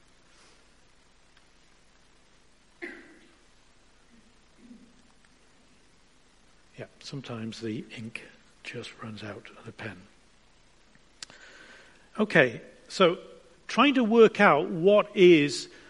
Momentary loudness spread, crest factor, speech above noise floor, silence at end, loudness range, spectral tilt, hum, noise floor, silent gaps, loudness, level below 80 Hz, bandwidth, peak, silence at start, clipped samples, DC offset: 26 LU; 24 dB; 37 dB; 0.25 s; 28 LU; -5.5 dB/octave; none; -62 dBFS; none; -23 LUFS; -66 dBFS; 11 kHz; -4 dBFS; 2.8 s; under 0.1%; under 0.1%